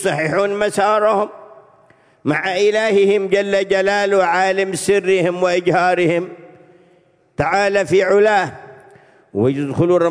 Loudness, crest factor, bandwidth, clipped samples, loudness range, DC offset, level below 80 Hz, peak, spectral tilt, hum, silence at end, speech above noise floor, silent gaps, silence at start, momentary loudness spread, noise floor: -16 LUFS; 16 dB; 11 kHz; under 0.1%; 3 LU; under 0.1%; -54 dBFS; 0 dBFS; -5 dB/octave; none; 0 s; 39 dB; none; 0 s; 7 LU; -54 dBFS